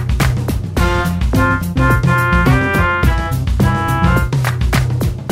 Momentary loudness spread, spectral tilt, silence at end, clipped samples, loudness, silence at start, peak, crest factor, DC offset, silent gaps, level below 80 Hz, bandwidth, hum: 5 LU; -6.5 dB/octave; 0 s; under 0.1%; -15 LUFS; 0 s; -2 dBFS; 12 dB; under 0.1%; none; -20 dBFS; 16.5 kHz; none